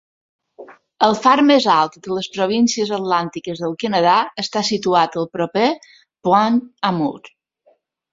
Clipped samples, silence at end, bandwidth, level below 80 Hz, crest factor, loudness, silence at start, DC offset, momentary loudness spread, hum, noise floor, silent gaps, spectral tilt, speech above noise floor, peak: under 0.1%; 0.85 s; 7.8 kHz; -62 dBFS; 18 dB; -17 LUFS; 0.6 s; under 0.1%; 11 LU; none; -59 dBFS; none; -4.5 dB/octave; 42 dB; 0 dBFS